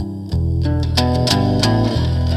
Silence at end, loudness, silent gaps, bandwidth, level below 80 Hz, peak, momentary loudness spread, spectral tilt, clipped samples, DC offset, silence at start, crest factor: 0 s; -17 LUFS; none; 14 kHz; -28 dBFS; 0 dBFS; 5 LU; -6 dB/octave; under 0.1%; under 0.1%; 0 s; 16 dB